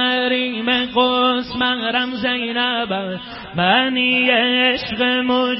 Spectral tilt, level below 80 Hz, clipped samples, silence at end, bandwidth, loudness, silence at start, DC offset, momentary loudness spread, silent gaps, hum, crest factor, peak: -9 dB/octave; -52 dBFS; under 0.1%; 0 s; 5.8 kHz; -17 LUFS; 0 s; under 0.1%; 7 LU; none; none; 16 dB; -2 dBFS